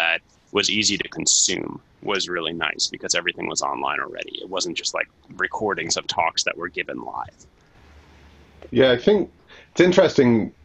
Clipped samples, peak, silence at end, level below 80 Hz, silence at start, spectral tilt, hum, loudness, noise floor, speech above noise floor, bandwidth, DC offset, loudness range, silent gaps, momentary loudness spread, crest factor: under 0.1%; -2 dBFS; 0.15 s; -56 dBFS; 0 s; -2.5 dB/octave; none; -21 LUFS; -50 dBFS; 28 dB; 10 kHz; under 0.1%; 5 LU; none; 14 LU; 22 dB